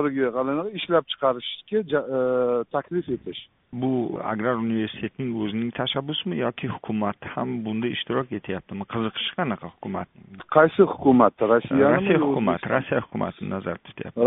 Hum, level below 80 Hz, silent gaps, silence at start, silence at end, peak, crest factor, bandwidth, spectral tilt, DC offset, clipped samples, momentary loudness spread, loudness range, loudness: none; -60 dBFS; none; 0 s; 0 s; -2 dBFS; 22 dB; 4 kHz; -4.5 dB/octave; under 0.1%; under 0.1%; 13 LU; 8 LU; -24 LUFS